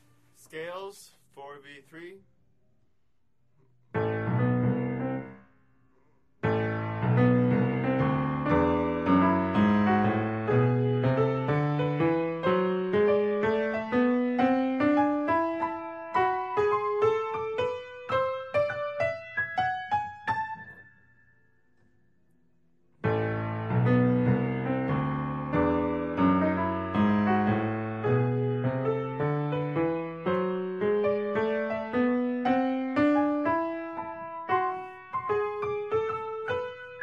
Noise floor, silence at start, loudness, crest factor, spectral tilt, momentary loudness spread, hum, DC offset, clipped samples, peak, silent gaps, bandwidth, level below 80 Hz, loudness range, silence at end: -76 dBFS; 0.55 s; -27 LUFS; 16 dB; -9 dB/octave; 11 LU; none; under 0.1%; under 0.1%; -12 dBFS; none; 8.4 kHz; -56 dBFS; 8 LU; 0 s